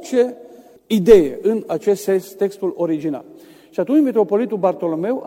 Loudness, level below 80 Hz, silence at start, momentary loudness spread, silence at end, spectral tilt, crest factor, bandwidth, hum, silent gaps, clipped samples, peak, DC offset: -18 LUFS; -46 dBFS; 0 s; 12 LU; 0 s; -6.5 dB/octave; 18 dB; 16.5 kHz; none; none; under 0.1%; 0 dBFS; under 0.1%